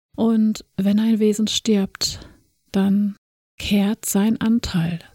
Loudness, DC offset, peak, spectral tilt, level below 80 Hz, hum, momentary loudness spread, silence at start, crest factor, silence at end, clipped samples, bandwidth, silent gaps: -20 LUFS; under 0.1%; -6 dBFS; -5 dB/octave; -46 dBFS; none; 6 LU; 0.2 s; 14 dB; 0.15 s; under 0.1%; 17 kHz; 3.18-3.58 s